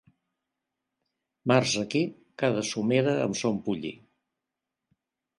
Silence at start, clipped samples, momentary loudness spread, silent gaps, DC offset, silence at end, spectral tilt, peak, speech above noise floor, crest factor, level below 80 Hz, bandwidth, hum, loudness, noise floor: 1.45 s; under 0.1%; 10 LU; none; under 0.1%; 1.45 s; -5 dB/octave; -6 dBFS; 60 dB; 22 dB; -68 dBFS; 11.5 kHz; none; -27 LUFS; -87 dBFS